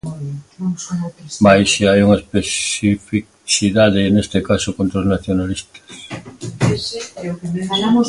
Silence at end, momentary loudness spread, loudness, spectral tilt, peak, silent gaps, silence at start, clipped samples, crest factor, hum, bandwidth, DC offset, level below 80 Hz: 0 s; 16 LU; -17 LUFS; -5 dB/octave; 0 dBFS; none; 0.05 s; under 0.1%; 16 dB; none; 11.5 kHz; under 0.1%; -40 dBFS